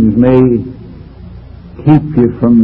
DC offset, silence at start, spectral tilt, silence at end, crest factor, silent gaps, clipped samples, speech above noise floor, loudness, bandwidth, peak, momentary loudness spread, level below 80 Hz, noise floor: under 0.1%; 0 s; -12 dB/octave; 0 s; 10 dB; none; 0.6%; 22 dB; -10 LUFS; 4.2 kHz; 0 dBFS; 23 LU; -32 dBFS; -31 dBFS